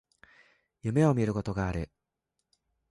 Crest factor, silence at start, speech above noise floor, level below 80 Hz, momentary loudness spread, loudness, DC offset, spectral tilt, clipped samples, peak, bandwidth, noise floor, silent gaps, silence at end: 20 dB; 0.85 s; 56 dB; -50 dBFS; 13 LU; -29 LUFS; under 0.1%; -8 dB/octave; under 0.1%; -12 dBFS; 11.5 kHz; -84 dBFS; none; 1.05 s